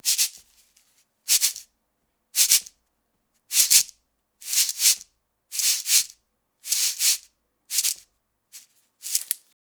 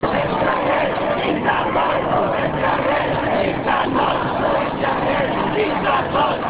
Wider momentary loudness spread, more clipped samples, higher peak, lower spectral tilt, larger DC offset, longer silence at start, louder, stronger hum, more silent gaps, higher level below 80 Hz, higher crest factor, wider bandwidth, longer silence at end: first, 15 LU vs 2 LU; neither; first, 0 dBFS vs -4 dBFS; second, 5.5 dB/octave vs -9.5 dB/octave; neither; about the same, 0.05 s vs 0 s; about the same, -21 LUFS vs -19 LUFS; neither; neither; second, -70 dBFS vs -42 dBFS; first, 26 dB vs 14 dB; first, over 20 kHz vs 4 kHz; first, 0.3 s vs 0 s